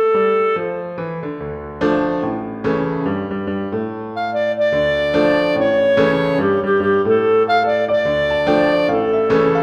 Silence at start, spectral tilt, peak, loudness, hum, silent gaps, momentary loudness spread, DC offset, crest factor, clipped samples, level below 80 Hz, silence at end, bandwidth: 0 s; -7 dB/octave; -4 dBFS; -17 LUFS; none; none; 10 LU; under 0.1%; 14 dB; under 0.1%; -46 dBFS; 0 s; 8.6 kHz